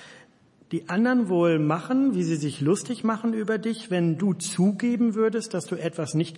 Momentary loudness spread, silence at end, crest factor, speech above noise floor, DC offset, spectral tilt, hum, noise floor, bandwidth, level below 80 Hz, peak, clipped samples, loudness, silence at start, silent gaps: 7 LU; 0 s; 14 dB; 33 dB; under 0.1%; -6 dB/octave; none; -57 dBFS; 11.5 kHz; -74 dBFS; -10 dBFS; under 0.1%; -25 LUFS; 0 s; none